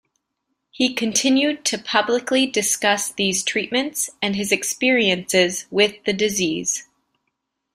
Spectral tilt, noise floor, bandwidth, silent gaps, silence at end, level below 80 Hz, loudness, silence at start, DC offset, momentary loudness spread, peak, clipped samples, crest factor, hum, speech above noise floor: -2 dB/octave; -76 dBFS; 16 kHz; none; 0.9 s; -62 dBFS; -20 LUFS; 0.75 s; under 0.1%; 5 LU; -2 dBFS; under 0.1%; 20 dB; none; 56 dB